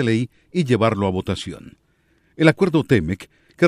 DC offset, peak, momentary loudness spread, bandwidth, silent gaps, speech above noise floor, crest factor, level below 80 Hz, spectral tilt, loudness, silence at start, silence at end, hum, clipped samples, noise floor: under 0.1%; 0 dBFS; 12 LU; 12.5 kHz; none; 42 dB; 20 dB; -48 dBFS; -7 dB/octave; -20 LUFS; 0 s; 0 s; none; under 0.1%; -62 dBFS